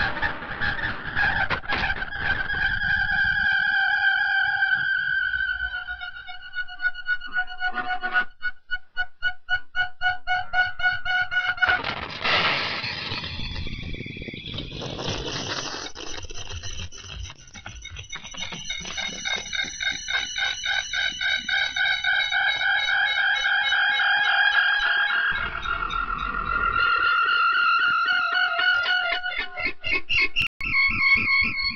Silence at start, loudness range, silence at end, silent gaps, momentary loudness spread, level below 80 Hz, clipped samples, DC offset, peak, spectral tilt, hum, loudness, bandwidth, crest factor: 0 s; 11 LU; 0 s; 30.47-30.60 s; 14 LU; -42 dBFS; under 0.1%; under 0.1%; -8 dBFS; -2 dB/octave; none; -23 LUFS; 7 kHz; 16 dB